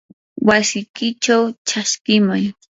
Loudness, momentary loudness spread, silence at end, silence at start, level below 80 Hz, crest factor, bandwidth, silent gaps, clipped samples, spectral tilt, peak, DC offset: -17 LUFS; 7 LU; 0.2 s; 0.35 s; -56 dBFS; 18 dB; 8 kHz; 0.89-0.94 s, 1.58-1.65 s, 2.01-2.05 s; under 0.1%; -3.5 dB/octave; 0 dBFS; under 0.1%